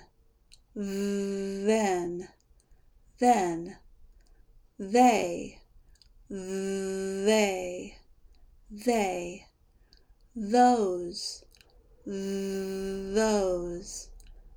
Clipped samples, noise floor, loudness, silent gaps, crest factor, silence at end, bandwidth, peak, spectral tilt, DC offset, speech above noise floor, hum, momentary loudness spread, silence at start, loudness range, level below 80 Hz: under 0.1%; -61 dBFS; -28 LUFS; none; 20 dB; 0 s; over 20 kHz; -10 dBFS; -4.5 dB/octave; under 0.1%; 33 dB; none; 21 LU; 0.75 s; 4 LU; -56 dBFS